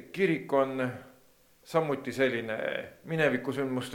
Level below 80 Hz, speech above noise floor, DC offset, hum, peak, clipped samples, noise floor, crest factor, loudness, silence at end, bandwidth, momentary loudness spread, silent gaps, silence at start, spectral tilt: -72 dBFS; 32 dB; under 0.1%; none; -12 dBFS; under 0.1%; -61 dBFS; 20 dB; -30 LUFS; 0 s; 18.5 kHz; 8 LU; none; 0 s; -6 dB/octave